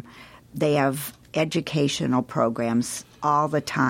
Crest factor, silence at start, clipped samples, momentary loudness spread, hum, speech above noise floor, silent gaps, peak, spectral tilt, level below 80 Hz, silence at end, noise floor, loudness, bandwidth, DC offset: 18 dB; 0.05 s; under 0.1%; 9 LU; none; 24 dB; none; -8 dBFS; -5 dB/octave; -60 dBFS; 0 s; -47 dBFS; -24 LUFS; 16.5 kHz; under 0.1%